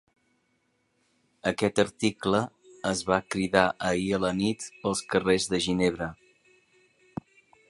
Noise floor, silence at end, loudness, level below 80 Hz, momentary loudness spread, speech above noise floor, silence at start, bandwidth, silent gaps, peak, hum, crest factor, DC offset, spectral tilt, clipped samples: -72 dBFS; 1.55 s; -27 LUFS; -56 dBFS; 12 LU; 46 dB; 1.45 s; 11.5 kHz; none; -4 dBFS; none; 26 dB; under 0.1%; -4.5 dB/octave; under 0.1%